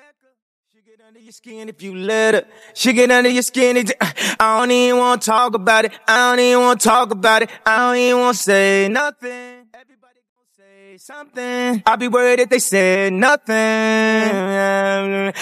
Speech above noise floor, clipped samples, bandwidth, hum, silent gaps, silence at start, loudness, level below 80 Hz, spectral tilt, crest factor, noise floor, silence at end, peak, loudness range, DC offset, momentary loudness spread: 35 dB; under 0.1%; 15 kHz; none; 10.29-10.36 s; 1.45 s; -15 LUFS; -62 dBFS; -3 dB/octave; 16 dB; -51 dBFS; 0 s; 0 dBFS; 6 LU; under 0.1%; 10 LU